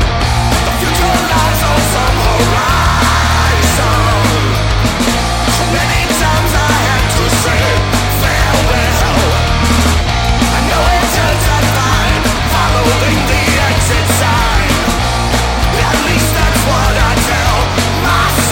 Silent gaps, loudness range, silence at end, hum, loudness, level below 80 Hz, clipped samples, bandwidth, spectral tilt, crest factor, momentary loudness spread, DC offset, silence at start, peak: none; 1 LU; 0 s; none; -11 LUFS; -18 dBFS; under 0.1%; 17 kHz; -4 dB/octave; 10 dB; 2 LU; under 0.1%; 0 s; -2 dBFS